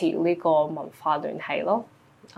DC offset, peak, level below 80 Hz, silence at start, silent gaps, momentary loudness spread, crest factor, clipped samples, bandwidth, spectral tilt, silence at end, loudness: under 0.1%; -10 dBFS; -74 dBFS; 0 s; none; 7 LU; 16 dB; under 0.1%; 12.5 kHz; -7 dB/octave; 0.5 s; -26 LUFS